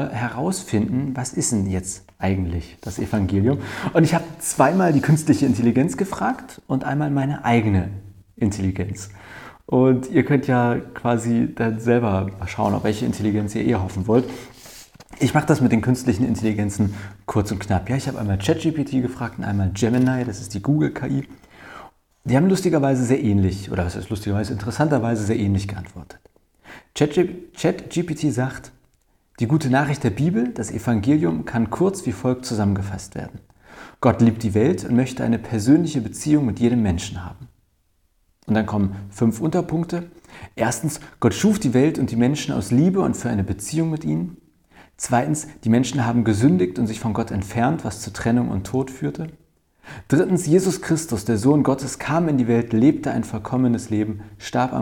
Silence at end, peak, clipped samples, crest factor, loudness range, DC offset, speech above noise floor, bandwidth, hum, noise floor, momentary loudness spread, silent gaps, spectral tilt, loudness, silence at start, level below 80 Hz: 0 s; -2 dBFS; under 0.1%; 20 dB; 4 LU; under 0.1%; 44 dB; 17.5 kHz; none; -64 dBFS; 10 LU; none; -6.5 dB/octave; -21 LUFS; 0 s; -46 dBFS